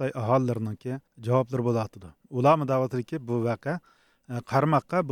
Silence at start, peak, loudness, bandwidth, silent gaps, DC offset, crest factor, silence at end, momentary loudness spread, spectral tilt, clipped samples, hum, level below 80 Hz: 0 s; -8 dBFS; -27 LUFS; 14.5 kHz; none; under 0.1%; 18 dB; 0 s; 13 LU; -8 dB/octave; under 0.1%; none; -66 dBFS